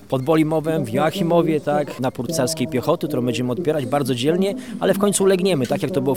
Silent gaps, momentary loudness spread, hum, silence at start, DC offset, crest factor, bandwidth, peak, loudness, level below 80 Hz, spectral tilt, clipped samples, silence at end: none; 5 LU; none; 0.05 s; 0.4%; 16 dB; 17.5 kHz; -4 dBFS; -20 LUFS; -56 dBFS; -5.5 dB/octave; under 0.1%; 0 s